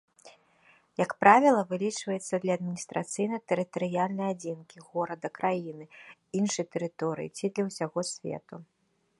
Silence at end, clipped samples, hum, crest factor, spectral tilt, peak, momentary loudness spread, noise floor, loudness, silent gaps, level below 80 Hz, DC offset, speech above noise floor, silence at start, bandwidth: 0.55 s; under 0.1%; none; 26 dB; -5 dB/octave; -4 dBFS; 16 LU; -63 dBFS; -29 LUFS; none; -76 dBFS; under 0.1%; 34 dB; 0.25 s; 11.5 kHz